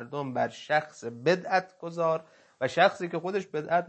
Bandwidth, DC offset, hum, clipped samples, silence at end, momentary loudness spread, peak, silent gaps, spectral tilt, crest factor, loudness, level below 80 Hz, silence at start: 8.6 kHz; under 0.1%; none; under 0.1%; 0 s; 10 LU; -8 dBFS; none; -5.5 dB/octave; 20 dB; -29 LUFS; -78 dBFS; 0 s